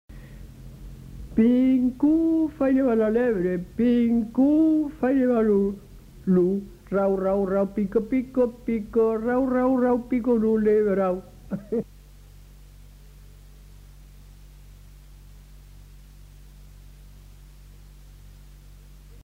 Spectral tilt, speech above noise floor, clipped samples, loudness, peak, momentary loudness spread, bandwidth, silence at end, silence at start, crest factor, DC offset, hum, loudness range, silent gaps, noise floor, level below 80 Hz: -9 dB/octave; 26 dB; under 0.1%; -23 LUFS; -10 dBFS; 15 LU; 15 kHz; 0.1 s; 0.1 s; 14 dB; under 0.1%; none; 6 LU; none; -47 dBFS; -48 dBFS